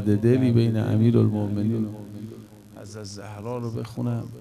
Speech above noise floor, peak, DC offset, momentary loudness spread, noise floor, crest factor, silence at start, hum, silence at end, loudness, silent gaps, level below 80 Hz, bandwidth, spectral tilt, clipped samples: 21 dB; -6 dBFS; under 0.1%; 20 LU; -43 dBFS; 18 dB; 0 s; none; 0 s; -23 LUFS; none; -58 dBFS; 12 kHz; -8.5 dB/octave; under 0.1%